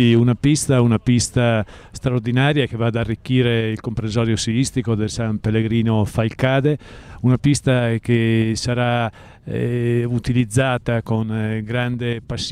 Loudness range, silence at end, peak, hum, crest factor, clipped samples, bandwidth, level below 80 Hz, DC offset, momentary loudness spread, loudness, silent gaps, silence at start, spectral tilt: 2 LU; 0 s; -6 dBFS; none; 12 dB; under 0.1%; 13 kHz; -42 dBFS; under 0.1%; 7 LU; -19 LUFS; none; 0 s; -6 dB/octave